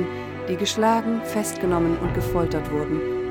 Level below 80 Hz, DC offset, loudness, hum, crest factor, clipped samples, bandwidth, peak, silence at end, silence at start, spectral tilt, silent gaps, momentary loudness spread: -40 dBFS; under 0.1%; -24 LUFS; none; 16 dB; under 0.1%; 19 kHz; -8 dBFS; 0 s; 0 s; -5.5 dB/octave; none; 6 LU